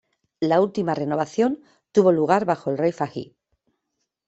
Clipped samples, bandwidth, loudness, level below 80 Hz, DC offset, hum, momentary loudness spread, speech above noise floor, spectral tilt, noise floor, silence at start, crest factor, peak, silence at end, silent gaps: under 0.1%; 8.2 kHz; -22 LUFS; -66 dBFS; under 0.1%; none; 11 LU; 57 dB; -7 dB/octave; -78 dBFS; 0.4 s; 20 dB; -2 dBFS; 1.05 s; none